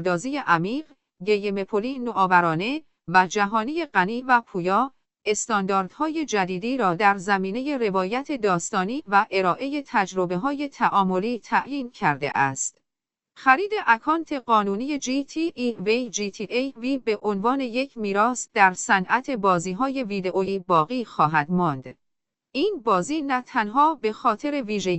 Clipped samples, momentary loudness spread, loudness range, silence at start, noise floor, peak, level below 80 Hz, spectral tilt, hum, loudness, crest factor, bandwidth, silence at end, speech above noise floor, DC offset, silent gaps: under 0.1%; 7 LU; 2 LU; 0 s; -87 dBFS; -4 dBFS; -62 dBFS; -4.5 dB/octave; none; -23 LUFS; 20 dB; 8.4 kHz; 0 s; 64 dB; under 0.1%; none